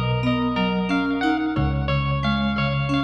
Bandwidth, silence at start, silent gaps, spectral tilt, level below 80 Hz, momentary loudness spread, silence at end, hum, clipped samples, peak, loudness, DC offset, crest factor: 7.2 kHz; 0 s; none; -7.5 dB/octave; -34 dBFS; 1 LU; 0 s; none; under 0.1%; -10 dBFS; -22 LUFS; under 0.1%; 12 dB